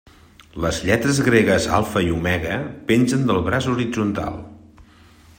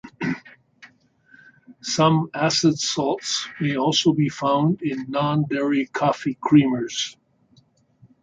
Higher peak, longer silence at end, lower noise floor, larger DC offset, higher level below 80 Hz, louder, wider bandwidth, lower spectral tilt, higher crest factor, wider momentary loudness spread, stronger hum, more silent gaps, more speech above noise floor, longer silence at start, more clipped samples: about the same, -2 dBFS vs -4 dBFS; second, 0.55 s vs 1.1 s; second, -49 dBFS vs -59 dBFS; neither; first, -44 dBFS vs -62 dBFS; about the same, -20 LUFS vs -21 LUFS; first, 16.5 kHz vs 9.2 kHz; about the same, -5.5 dB/octave vs -5 dB/octave; about the same, 18 dB vs 18 dB; about the same, 10 LU vs 10 LU; neither; neither; second, 29 dB vs 38 dB; first, 0.55 s vs 0.05 s; neither